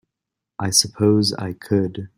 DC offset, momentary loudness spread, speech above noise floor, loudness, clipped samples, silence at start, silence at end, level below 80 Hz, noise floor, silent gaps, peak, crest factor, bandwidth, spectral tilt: under 0.1%; 9 LU; 64 dB; -19 LUFS; under 0.1%; 0.6 s; 0.1 s; -56 dBFS; -84 dBFS; none; 0 dBFS; 22 dB; 16 kHz; -4 dB/octave